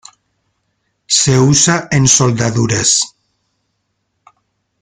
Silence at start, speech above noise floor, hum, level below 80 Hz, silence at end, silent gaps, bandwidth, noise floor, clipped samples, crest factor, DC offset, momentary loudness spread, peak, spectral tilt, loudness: 1.1 s; 56 dB; none; -44 dBFS; 1.75 s; none; 10 kHz; -68 dBFS; under 0.1%; 16 dB; under 0.1%; 5 LU; 0 dBFS; -3.5 dB/octave; -11 LUFS